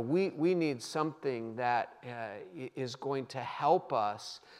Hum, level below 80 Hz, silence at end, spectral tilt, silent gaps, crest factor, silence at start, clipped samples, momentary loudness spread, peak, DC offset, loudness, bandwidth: none; -86 dBFS; 0 s; -6 dB/octave; none; 20 dB; 0 s; under 0.1%; 13 LU; -14 dBFS; under 0.1%; -34 LUFS; 13 kHz